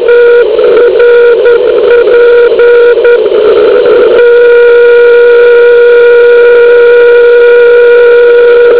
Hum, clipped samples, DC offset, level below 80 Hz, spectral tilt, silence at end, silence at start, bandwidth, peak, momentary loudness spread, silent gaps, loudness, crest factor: none; 30%; 3%; -42 dBFS; -7 dB/octave; 0 s; 0 s; 4 kHz; 0 dBFS; 2 LU; none; -2 LUFS; 2 dB